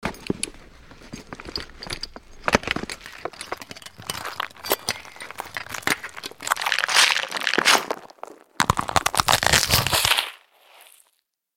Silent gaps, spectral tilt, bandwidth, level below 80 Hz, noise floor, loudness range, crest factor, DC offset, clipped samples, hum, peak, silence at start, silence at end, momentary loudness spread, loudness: none; -1.5 dB/octave; 17 kHz; -46 dBFS; -70 dBFS; 10 LU; 26 dB; under 0.1%; under 0.1%; none; 0 dBFS; 0 s; 1.2 s; 19 LU; -22 LUFS